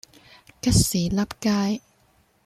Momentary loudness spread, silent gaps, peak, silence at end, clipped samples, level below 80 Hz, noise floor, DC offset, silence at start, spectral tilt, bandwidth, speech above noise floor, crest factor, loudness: 8 LU; none; -6 dBFS; 0.7 s; under 0.1%; -40 dBFS; -62 dBFS; under 0.1%; 0.65 s; -4.5 dB/octave; 14.5 kHz; 40 dB; 20 dB; -23 LUFS